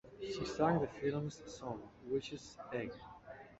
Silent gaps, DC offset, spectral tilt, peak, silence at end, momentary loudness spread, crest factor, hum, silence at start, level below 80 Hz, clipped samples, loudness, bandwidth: none; under 0.1%; -5.5 dB/octave; -18 dBFS; 0.05 s; 15 LU; 22 dB; none; 0.05 s; -64 dBFS; under 0.1%; -40 LUFS; 8 kHz